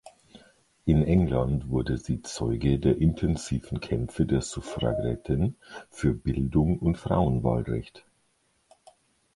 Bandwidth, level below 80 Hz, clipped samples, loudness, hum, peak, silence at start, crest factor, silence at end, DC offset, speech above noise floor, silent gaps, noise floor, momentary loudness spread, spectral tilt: 11.5 kHz; -38 dBFS; under 0.1%; -27 LUFS; none; -8 dBFS; 0.05 s; 18 dB; 1.35 s; under 0.1%; 44 dB; none; -70 dBFS; 9 LU; -7.5 dB/octave